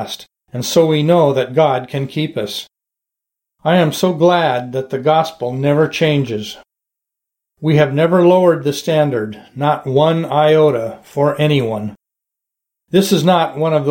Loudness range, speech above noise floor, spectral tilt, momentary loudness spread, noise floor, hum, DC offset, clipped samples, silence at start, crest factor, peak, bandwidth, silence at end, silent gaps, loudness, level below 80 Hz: 3 LU; 69 dB; -6 dB/octave; 12 LU; -83 dBFS; none; under 0.1%; under 0.1%; 0 s; 14 dB; 0 dBFS; 17 kHz; 0 s; none; -15 LUFS; -58 dBFS